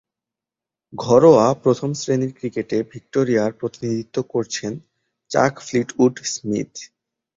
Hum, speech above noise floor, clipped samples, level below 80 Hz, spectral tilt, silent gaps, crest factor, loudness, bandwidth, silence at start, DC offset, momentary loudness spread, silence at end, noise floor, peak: none; 69 dB; under 0.1%; -60 dBFS; -5.5 dB/octave; none; 18 dB; -20 LUFS; 7.8 kHz; 0.95 s; under 0.1%; 14 LU; 0.5 s; -88 dBFS; -2 dBFS